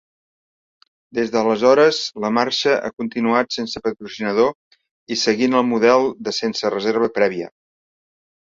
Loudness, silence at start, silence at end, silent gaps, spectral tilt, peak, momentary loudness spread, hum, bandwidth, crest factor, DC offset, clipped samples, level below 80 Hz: -19 LUFS; 1.15 s; 1 s; 4.55-4.71 s, 4.91-5.07 s; -4 dB/octave; -2 dBFS; 11 LU; none; 7.8 kHz; 18 dB; under 0.1%; under 0.1%; -62 dBFS